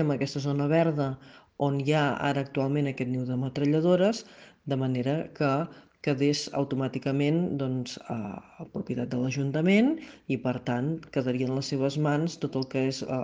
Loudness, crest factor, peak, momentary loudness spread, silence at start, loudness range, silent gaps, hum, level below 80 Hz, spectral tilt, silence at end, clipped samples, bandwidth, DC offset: -28 LUFS; 16 dB; -12 dBFS; 11 LU; 0 s; 2 LU; none; none; -66 dBFS; -6.5 dB/octave; 0 s; under 0.1%; 9.4 kHz; under 0.1%